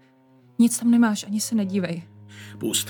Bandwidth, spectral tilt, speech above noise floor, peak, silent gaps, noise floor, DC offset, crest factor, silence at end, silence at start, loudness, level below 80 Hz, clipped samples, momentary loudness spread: over 20 kHz; -4 dB/octave; 33 dB; -8 dBFS; none; -55 dBFS; under 0.1%; 16 dB; 0 s; 0.6 s; -22 LUFS; -76 dBFS; under 0.1%; 19 LU